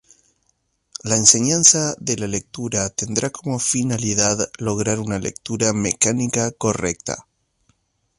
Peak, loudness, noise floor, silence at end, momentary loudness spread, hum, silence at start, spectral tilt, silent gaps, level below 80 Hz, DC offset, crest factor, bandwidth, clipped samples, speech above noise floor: 0 dBFS; -18 LUFS; -68 dBFS; 1 s; 14 LU; none; 1.05 s; -3 dB/octave; none; -50 dBFS; under 0.1%; 22 dB; 11.5 kHz; under 0.1%; 48 dB